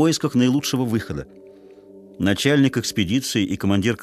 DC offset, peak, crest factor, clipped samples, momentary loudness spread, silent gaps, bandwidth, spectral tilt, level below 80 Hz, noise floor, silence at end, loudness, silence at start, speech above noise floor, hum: under 0.1%; -4 dBFS; 18 dB; under 0.1%; 8 LU; none; 14 kHz; -5 dB/octave; -50 dBFS; -45 dBFS; 0 s; -20 LUFS; 0 s; 25 dB; none